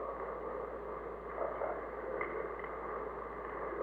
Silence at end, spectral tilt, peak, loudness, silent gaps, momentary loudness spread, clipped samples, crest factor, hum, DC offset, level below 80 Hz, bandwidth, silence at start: 0 s; -8 dB/octave; -24 dBFS; -41 LUFS; none; 4 LU; under 0.1%; 18 dB; none; under 0.1%; -58 dBFS; 7.6 kHz; 0 s